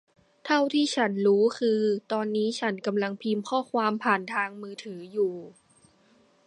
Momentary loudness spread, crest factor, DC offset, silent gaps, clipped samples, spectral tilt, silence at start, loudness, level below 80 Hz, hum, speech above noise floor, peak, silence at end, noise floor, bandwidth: 12 LU; 20 dB; under 0.1%; none; under 0.1%; -5 dB/octave; 0.45 s; -26 LUFS; -80 dBFS; none; 36 dB; -8 dBFS; 1 s; -62 dBFS; 10.5 kHz